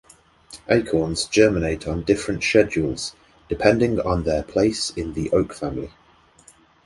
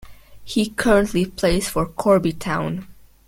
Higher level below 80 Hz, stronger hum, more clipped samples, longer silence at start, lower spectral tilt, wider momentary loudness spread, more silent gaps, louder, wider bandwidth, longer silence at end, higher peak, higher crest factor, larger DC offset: about the same, -40 dBFS vs -36 dBFS; neither; neither; first, 0.5 s vs 0 s; about the same, -5 dB/octave vs -5.5 dB/octave; first, 12 LU vs 8 LU; neither; about the same, -21 LUFS vs -20 LUFS; second, 11.5 kHz vs 17 kHz; first, 1 s vs 0.35 s; about the same, -2 dBFS vs -2 dBFS; about the same, 20 dB vs 18 dB; neither